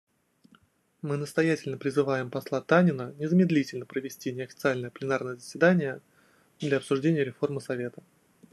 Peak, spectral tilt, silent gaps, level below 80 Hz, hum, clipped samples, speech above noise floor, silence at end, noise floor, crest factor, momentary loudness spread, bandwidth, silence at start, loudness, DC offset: -8 dBFS; -7 dB/octave; none; -74 dBFS; none; under 0.1%; 36 dB; 0.6 s; -63 dBFS; 20 dB; 12 LU; 12.5 kHz; 1.05 s; -28 LUFS; under 0.1%